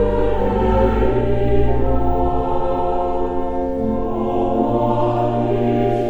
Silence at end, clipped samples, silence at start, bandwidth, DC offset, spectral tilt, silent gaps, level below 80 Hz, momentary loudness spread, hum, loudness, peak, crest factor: 0 s; under 0.1%; 0 s; over 20 kHz; 1%; -9.5 dB/octave; none; -26 dBFS; 4 LU; none; -19 LUFS; -2 dBFS; 14 dB